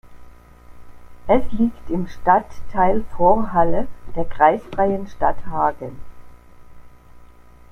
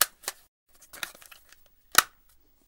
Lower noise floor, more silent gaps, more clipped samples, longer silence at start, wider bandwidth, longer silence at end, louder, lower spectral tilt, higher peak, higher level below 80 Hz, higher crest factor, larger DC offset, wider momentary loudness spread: second, -44 dBFS vs -61 dBFS; second, none vs 0.48-0.66 s; neither; about the same, 0.1 s vs 0 s; second, 6.4 kHz vs 18 kHz; second, 0.45 s vs 0.65 s; first, -20 LUFS vs -27 LUFS; first, -8.5 dB/octave vs 1.5 dB/octave; about the same, -2 dBFS vs -2 dBFS; first, -36 dBFS vs -64 dBFS; second, 18 dB vs 30 dB; neither; second, 13 LU vs 24 LU